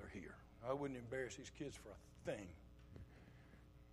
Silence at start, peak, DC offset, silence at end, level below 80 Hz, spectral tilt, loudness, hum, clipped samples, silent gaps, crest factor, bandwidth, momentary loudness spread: 0 s; -30 dBFS; under 0.1%; 0 s; -66 dBFS; -5.5 dB/octave; -51 LUFS; none; under 0.1%; none; 22 dB; 15 kHz; 18 LU